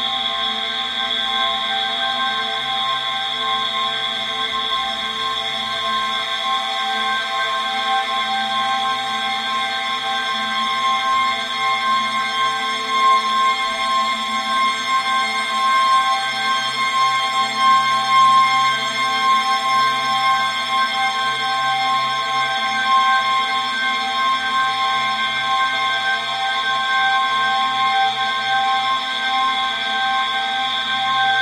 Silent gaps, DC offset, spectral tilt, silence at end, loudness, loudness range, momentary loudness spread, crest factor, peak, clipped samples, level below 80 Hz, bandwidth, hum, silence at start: none; under 0.1%; -0.5 dB/octave; 0 s; -18 LUFS; 4 LU; 5 LU; 14 dB; -4 dBFS; under 0.1%; -62 dBFS; 14.5 kHz; none; 0 s